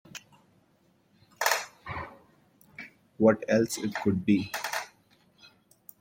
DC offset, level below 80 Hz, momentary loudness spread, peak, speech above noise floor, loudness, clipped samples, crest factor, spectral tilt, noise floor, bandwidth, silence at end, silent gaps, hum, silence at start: under 0.1%; -64 dBFS; 22 LU; -8 dBFS; 41 dB; -28 LUFS; under 0.1%; 24 dB; -4.5 dB/octave; -66 dBFS; 16.5 kHz; 0.55 s; none; none; 0.15 s